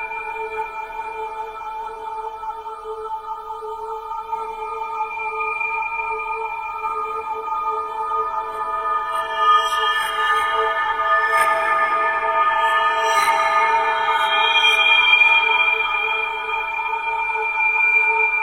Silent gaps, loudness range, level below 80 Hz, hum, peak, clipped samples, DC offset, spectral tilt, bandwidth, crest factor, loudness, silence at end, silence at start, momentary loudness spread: none; 14 LU; -52 dBFS; none; -2 dBFS; under 0.1%; under 0.1%; 0 dB/octave; 16 kHz; 18 dB; -18 LUFS; 0 s; 0 s; 16 LU